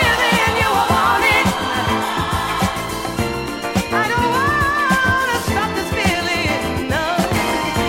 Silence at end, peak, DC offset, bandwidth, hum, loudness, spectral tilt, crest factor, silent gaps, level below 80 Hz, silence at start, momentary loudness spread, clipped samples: 0 s; -2 dBFS; under 0.1%; 17 kHz; none; -17 LUFS; -4 dB/octave; 14 dB; none; -34 dBFS; 0 s; 7 LU; under 0.1%